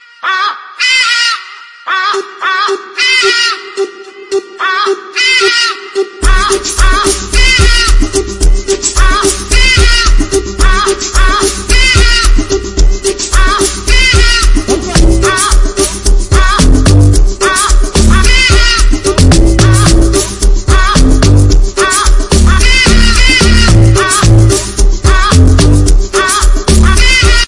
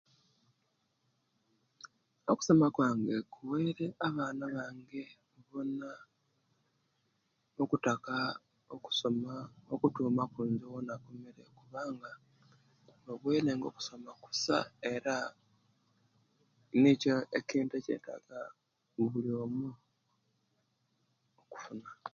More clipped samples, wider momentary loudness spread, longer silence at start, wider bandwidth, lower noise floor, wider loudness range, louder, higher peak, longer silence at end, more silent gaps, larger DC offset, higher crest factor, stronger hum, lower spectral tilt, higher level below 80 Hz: first, 1% vs under 0.1%; second, 7 LU vs 20 LU; second, 0.25 s vs 1.85 s; first, 11.5 kHz vs 7.6 kHz; second, -29 dBFS vs -79 dBFS; second, 3 LU vs 8 LU; first, -8 LUFS vs -34 LUFS; first, 0 dBFS vs -14 dBFS; about the same, 0 s vs 0.05 s; neither; neither; second, 6 dB vs 22 dB; neither; second, -3.5 dB/octave vs -5.5 dB/octave; first, -10 dBFS vs -76 dBFS